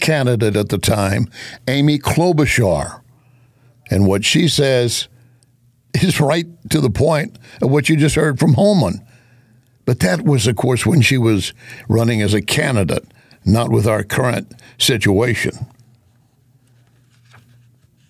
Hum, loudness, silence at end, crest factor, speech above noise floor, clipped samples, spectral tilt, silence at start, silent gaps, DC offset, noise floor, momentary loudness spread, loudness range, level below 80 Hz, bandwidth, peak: none; -16 LUFS; 2.45 s; 14 dB; 40 dB; under 0.1%; -5.5 dB/octave; 0 s; none; under 0.1%; -55 dBFS; 11 LU; 3 LU; -38 dBFS; 16 kHz; -4 dBFS